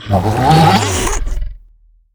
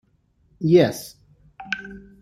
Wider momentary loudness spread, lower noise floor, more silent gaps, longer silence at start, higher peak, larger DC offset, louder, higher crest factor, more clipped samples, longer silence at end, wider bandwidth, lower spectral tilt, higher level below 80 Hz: second, 17 LU vs 24 LU; second, -47 dBFS vs -62 dBFS; neither; second, 0 s vs 0.6 s; first, 0 dBFS vs -4 dBFS; neither; first, -12 LUFS vs -21 LUFS; second, 14 dB vs 20 dB; neither; first, 0.6 s vs 0.25 s; first, over 20 kHz vs 15 kHz; second, -5 dB/octave vs -6.5 dB/octave; first, -24 dBFS vs -56 dBFS